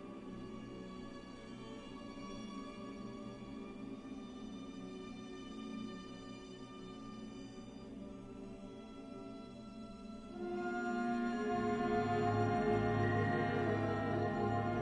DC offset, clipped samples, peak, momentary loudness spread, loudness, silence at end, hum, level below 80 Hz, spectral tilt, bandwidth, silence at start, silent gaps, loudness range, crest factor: under 0.1%; under 0.1%; -22 dBFS; 16 LU; -41 LUFS; 0 s; none; -60 dBFS; -7.5 dB/octave; 10 kHz; 0 s; none; 15 LU; 18 dB